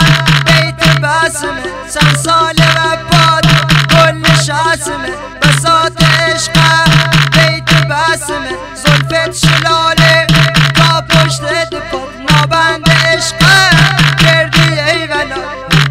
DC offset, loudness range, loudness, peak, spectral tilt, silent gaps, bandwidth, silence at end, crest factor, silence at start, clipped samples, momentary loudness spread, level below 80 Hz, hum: under 0.1%; 1 LU; -8 LUFS; 0 dBFS; -4 dB/octave; none; 16 kHz; 0 s; 10 dB; 0 s; 0.2%; 9 LU; -28 dBFS; none